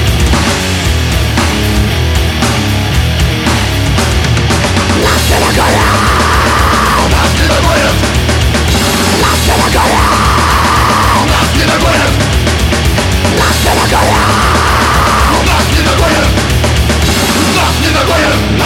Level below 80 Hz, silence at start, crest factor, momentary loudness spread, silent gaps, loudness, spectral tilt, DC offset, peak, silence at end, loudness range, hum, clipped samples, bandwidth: -16 dBFS; 0 s; 8 dB; 3 LU; none; -9 LUFS; -4 dB/octave; under 0.1%; 0 dBFS; 0 s; 2 LU; none; 0.1%; 17 kHz